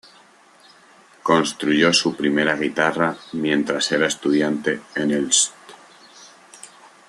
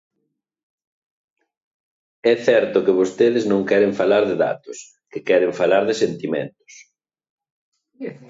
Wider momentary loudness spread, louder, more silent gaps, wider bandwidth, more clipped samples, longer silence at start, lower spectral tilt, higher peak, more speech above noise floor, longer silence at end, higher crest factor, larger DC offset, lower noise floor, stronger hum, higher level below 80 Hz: second, 7 LU vs 17 LU; about the same, -20 LUFS vs -18 LUFS; second, none vs 7.30-7.38 s, 7.50-7.72 s; first, 12.5 kHz vs 7.8 kHz; neither; second, 1.25 s vs 2.25 s; second, -3 dB/octave vs -5.5 dB/octave; about the same, -2 dBFS vs -4 dBFS; second, 31 dB vs 57 dB; first, 0.4 s vs 0.15 s; about the same, 20 dB vs 18 dB; neither; second, -51 dBFS vs -75 dBFS; neither; about the same, -64 dBFS vs -66 dBFS